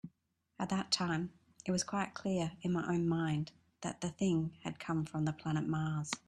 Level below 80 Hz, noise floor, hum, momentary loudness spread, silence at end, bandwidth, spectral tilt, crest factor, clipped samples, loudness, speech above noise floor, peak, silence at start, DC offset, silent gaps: -68 dBFS; -79 dBFS; none; 10 LU; 0.1 s; 11.5 kHz; -5 dB/octave; 20 dB; under 0.1%; -37 LUFS; 43 dB; -16 dBFS; 0.05 s; under 0.1%; none